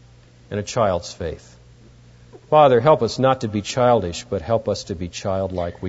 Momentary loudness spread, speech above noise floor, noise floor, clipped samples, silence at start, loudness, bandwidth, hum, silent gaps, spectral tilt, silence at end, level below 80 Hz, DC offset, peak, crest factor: 15 LU; 29 dB; -48 dBFS; under 0.1%; 0.5 s; -20 LUFS; 8 kHz; 60 Hz at -50 dBFS; none; -5.5 dB/octave; 0 s; -46 dBFS; under 0.1%; -2 dBFS; 18 dB